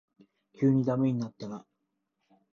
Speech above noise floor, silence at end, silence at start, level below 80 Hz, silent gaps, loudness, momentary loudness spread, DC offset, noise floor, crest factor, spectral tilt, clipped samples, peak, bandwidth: 53 dB; 0.95 s; 0.6 s; -68 dBFS; none; -28 LUFS; 16 LU; under 0.1%; -81 dBFS; 18 dB; -9.5 dB/octave; under 0.1%; -14 dBFS; 6.8 kHz